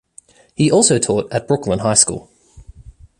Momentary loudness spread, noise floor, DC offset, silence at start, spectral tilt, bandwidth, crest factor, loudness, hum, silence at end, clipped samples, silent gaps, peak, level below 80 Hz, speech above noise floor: 8 LU; -48 dBFS; under 0.1%; 0.6 s; -4 dB/octave; 13.5 kHz; 18 dB; -15 LUFS; none; 0.3 s; under 0.1%; none; 0 dBFS; -46 dBFS; 32 dB